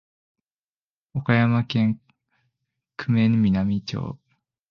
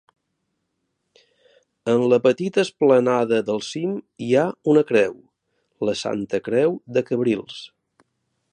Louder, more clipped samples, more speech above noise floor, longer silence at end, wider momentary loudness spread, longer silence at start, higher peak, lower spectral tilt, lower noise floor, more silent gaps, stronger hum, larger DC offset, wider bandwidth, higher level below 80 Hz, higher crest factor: about the same, -23 LUFS vs -21 LUFS; neither; first, over 69 dB vs 55 dB; second, 0.55 s vs 0.85 s; first, 15 LU vs 10 LU; second, 1.15 s vs 1.85 s; about the same, -4 dBFS vs -4 dBFS; first, -8 dB/octave vs -6 dB/octave; first, under -90 dBFS vs -75 dBFS; neither; neither; neither; second, 6.6 kHz vs 9.6 kHz; first, -52 dBFS vs -66 dBFS; about the same, 22 dB vs 18 dB